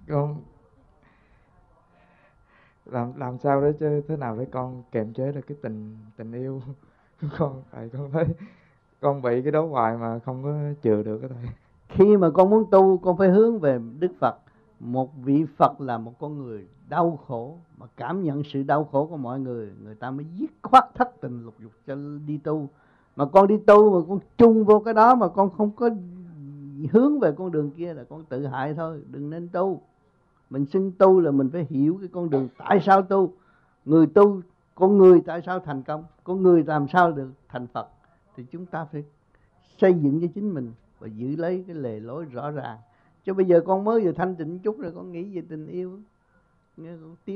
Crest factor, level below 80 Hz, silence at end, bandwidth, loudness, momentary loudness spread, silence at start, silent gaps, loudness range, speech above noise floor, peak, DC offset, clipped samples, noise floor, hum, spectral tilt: 20 dB; -60 dBFS; 0 s; 6.4 kHz; -22 LUFS; 20 LU; 0.1 s; none; 11 LU; 42 dB; -2 dBFS; under 0.1%; under 0.1%; -64 dBFS; none; -9.5 dB/octave